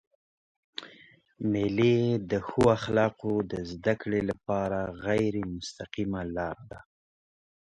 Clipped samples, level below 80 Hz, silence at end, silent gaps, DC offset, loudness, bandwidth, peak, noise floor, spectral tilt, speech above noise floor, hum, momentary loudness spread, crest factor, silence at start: under 0.1%; -54 dBFS; 0.95 s; none; under 0.1%; -29 LUFS; 11.5 kHz; -8 dBFS; -57 dBFS; -7 dB/octave; 29 dB; none; 18 LU; 22 dB; 0.8 s